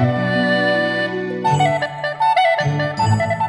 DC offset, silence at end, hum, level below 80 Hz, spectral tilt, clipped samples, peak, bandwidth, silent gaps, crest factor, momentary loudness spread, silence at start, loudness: under 0.1%; 0 s; none; -50 dBFS; -6 dB/octave; under 0.1%; -4 dBFS; 11.5 kHz; none; 14 dB; 6 LU; 0 s; -17 LUFS